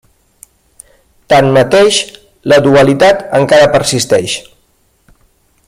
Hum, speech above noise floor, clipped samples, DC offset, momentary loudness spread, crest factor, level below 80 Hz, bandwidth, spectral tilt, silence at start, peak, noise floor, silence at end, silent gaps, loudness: none; 46 dB; under 0.1%; under 0.1%; 11 LU; 12 dB; -44 dBFS; 15 kHz; -4.5 dB/octave; 1.3 s; 0 dBFS; -54 dBFS; 1.25 s; none; -9 LUFS